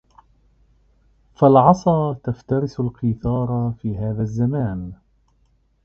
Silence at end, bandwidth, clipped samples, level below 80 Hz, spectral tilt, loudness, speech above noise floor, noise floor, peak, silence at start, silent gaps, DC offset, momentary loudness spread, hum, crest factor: 0.9 s; 6.8 kHz; under 0.1%; -44 dBFS; -9.5 dB/octave; -20 LUFS; 42 dB; -61 dBFS; 0 dBFS; 1.4 s; none; under 0.1%; 13 LU; none; 20 dB